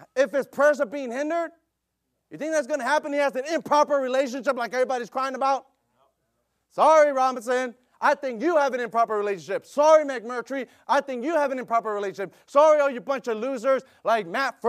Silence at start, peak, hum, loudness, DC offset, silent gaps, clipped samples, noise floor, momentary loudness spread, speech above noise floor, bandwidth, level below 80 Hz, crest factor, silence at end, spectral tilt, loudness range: 0.15 s; -6 dBFS; none; -24 LUFS; under 0.1%; none; under 0.1%; -78 dBFS; 11 LU; 55 dB; 14.5 kHz; -82 dBFS; 18 dB; 0 s; -3.5 dB/octave; 3 LU